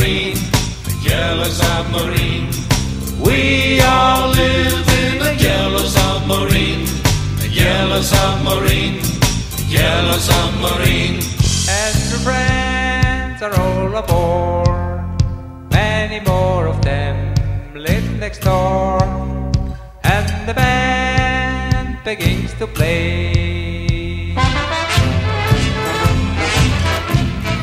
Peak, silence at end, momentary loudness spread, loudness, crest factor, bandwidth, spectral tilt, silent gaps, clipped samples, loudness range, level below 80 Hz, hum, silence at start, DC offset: 0 dBFS; 0 s; 6 LU; -16 LUFS; 16 dB; 16 kHz; -4.5 dB/octave; none; under 0.1%; 4 LU; -24 dBFS; none; 0 s; under 0.1%